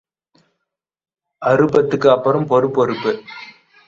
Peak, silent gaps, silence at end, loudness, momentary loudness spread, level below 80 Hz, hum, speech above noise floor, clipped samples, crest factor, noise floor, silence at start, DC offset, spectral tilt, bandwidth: -2 dBFS; none; 0.35 s; -16 LUFS; 13 LU; -58 dBFS; none; 63 dB; under 0.1%; 18 dB; -79 dBFS; 1.4 s; under 0.1%; -7.5 dB/octave; 7.4 kHz